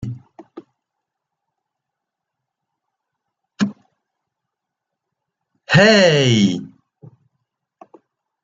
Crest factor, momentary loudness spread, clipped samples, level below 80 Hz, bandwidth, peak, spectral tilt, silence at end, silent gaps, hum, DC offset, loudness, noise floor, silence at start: 20 dB; 19 LU; under 0.1%; -58 dBFS; 7.8 kHz; 0 dBFS; -5 dB/octave; 1.75 s; none; none; under 0.1%; -15 LUFS; -82 dBFS; 0 s